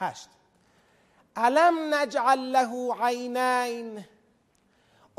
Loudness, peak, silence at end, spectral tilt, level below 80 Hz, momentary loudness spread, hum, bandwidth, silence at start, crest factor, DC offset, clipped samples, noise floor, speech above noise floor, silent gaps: -25 LUFS; -8 dBFS; 1.15 s; -3 dB/octave; -76 dBFS; 19 LU; none; 14.5 kHz; 0 s; 18 dB; under 0.1%; under 0.1%; -66 dBFS; 41 dB; none